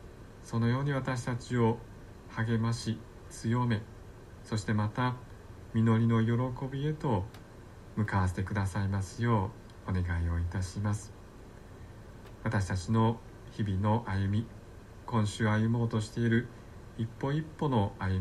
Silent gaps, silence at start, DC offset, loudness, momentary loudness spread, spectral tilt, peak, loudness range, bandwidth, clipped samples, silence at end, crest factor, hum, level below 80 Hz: none; 0 s; under 0.1%; -32 LUFS; 21 LU; -7 dB/octave; -16 dBFS; 3 LU; 12 kHz; under 0.1%; 0 s; 16 dB; none; -52 dBFS